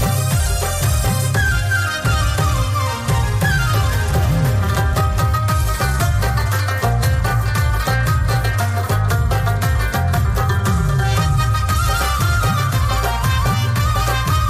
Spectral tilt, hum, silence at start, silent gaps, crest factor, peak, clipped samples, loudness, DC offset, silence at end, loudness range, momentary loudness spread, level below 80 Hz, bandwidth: -5 dB/octave; none; 0 s; none; 10 dB; -6 dBFS; under 0.1%; -17 LUFS; under 0.1%; 0 s; 1 LU; 2 LU; -22 dBFS; 15.5 kHz